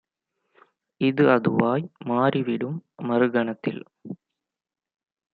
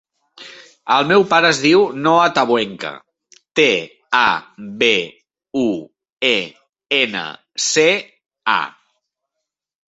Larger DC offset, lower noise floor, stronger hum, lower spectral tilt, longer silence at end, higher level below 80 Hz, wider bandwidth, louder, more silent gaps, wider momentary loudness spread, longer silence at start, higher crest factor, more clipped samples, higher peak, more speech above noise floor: neither; first, -85 dBFS vs -80 dBFS; neither; first, -10 dB/octave vs -3 dB/octave; about the same, 1.2 s vs 1.2 s; second, -68 dBFS vs -62 dBFS; second, 4.9 kHz vs 8.2 kHz; second, -23 LUFS vs -16 LUFS; second, none vs 6.13-6.17 s; first, 20 LU vs 16 LU; first, 1 s vs 0.4 s; first, 24 dB vs 18 dB; neither; about the same, -2 dBFS vs 0 dBFS; about the same, 62 dB vs 64 dB